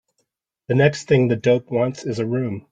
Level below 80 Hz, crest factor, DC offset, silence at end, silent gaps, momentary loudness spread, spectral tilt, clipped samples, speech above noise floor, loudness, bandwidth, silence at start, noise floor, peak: -58 dBFS; 18 dB; under 0.1%; 0.1 s; none; 7 LU; -7 dB/octave; under 0.1%; 54 dB; -20 LUFS; 9 kHz; 0.7 s; -73 dBFS; -2 dBFS